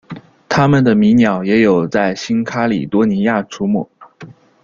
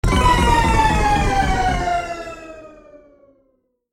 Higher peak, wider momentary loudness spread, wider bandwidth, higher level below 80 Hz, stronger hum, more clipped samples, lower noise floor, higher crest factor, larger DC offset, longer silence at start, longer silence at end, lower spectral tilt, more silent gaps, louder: about the same, -2 dBFS vs -2 dBFS; second, 8 LU vs 17 LU; second, 7.4 kHz vs 16 kHz; second, -50 dBFS vs -24 dBFS; neither; neither; second, -39 dBFS vs -65 dBFS; about the same, 14 dB vs 16 dB; neither; about the same, 0.1 s vs 0.05 s; second, 0.3 s vs 1.25 s; first, -7 dB/octave vs -5 dB/octave; neither; first, -14 LUFS vs -17 LUFS